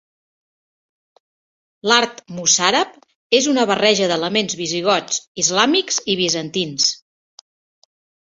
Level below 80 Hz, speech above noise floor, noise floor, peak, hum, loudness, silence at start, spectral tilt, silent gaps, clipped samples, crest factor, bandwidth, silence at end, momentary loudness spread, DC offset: -64 dBFS; over 72 dB; under -90 dBFS; 0 dBFS; none; -17 LUFS; 1.85 s; -2 dB/octave; 3.15-3.30 s, 5.27-5.35 s; under 0.1%; 20 dB; 8.2 kHz; 1.3 s; 8 LU; under 0.1%